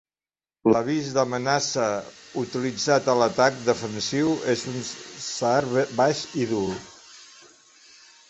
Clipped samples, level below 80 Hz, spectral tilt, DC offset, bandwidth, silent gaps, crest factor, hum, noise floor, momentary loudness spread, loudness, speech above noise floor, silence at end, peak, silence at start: under 0.1%; -62 dBFS; -4.5 dB/octave; under 0.1%; 8.4 kHz; none; 22 dB; none; under -90 dBFS; 12 LU; -24 LUFS; over 66 dB; 1.05 s; -4 dBFS; 0.65 s